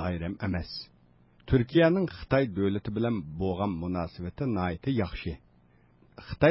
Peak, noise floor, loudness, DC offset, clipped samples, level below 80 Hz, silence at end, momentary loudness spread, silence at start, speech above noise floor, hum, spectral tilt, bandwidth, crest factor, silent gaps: -10 dBFS; -61 dBFS; -29 LUFS; under 0.1%; under 0.1%; -46 dBFS; 0 s; 15 LU; 0 s; 33 dB; none; -11 dB/octave; 5.8 kHz; 20 dB; none